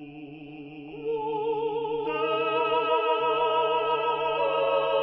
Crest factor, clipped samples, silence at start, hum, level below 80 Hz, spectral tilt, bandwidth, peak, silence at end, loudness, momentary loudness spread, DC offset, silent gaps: 14 dB; under 0.1%; 0 s; none; -66 dBFS; -8 dB/octave; 5.6 kHz; -12 dBFS; 0 s; -26 LUFS; 18 LU; under 0.1%; none